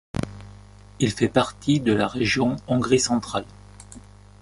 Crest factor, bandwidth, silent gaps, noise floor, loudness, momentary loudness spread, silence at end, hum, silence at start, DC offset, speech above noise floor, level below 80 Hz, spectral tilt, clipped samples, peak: 20 dB; 11.5 kHz; none; -45 dBFS; -23 LUFS; 23 LU; 0.4 s; 50 Hz at -40 dBFS; 0.15 s; under 0.1%; 23 dB; -46 dBFS; -5 dB/octave; under 0.1%; -4 dBFS